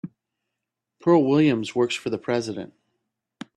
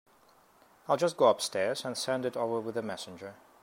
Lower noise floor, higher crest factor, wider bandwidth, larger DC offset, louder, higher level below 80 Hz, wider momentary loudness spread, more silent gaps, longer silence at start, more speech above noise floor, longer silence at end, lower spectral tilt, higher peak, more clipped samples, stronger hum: first, -84 dBFS vs -63 dBFS; about the same, 16 dB vs 20 dB; second, 10.5 kHz vs 16 kHz; neither; first, -22 LUFS vs -30 LUFS; first, -66 dBFS vs -78 dBFS; about the same, 18 LU vs 19 LU; neither; second, 0.05 s vs 0.9 s; first, 62 dB vs 32 dB; first, 0.9 s vs 0.3 s; first, -6 dB/octave vs -3.5 dB/octave; first, -8 dBFS vs -12 dBFS; neither; neither